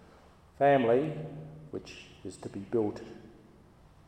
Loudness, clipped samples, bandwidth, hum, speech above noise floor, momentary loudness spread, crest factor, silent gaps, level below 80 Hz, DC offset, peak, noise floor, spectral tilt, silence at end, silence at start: -29 LUFS; under 0.1%; 9.8 kHz; none; 28 dB; 21 LU; 20 dB; none; -64 dBFS; under 0.1%; -14 dBFS; -58 dBFS; -7 dB/octave; 0.8 s; 0.6 s